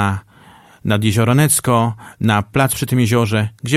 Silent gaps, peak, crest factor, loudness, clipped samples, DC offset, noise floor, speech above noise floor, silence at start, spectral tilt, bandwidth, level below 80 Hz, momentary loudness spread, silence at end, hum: none; 0 dBFS; 16 dB; -16 LUFS; under 0.1%; under 0.1%; -45 dBFS; 30 dB; 0 s; -5 dB/octave; 15.5 kHz; -46 dBFS; 8 LU; 0 s; none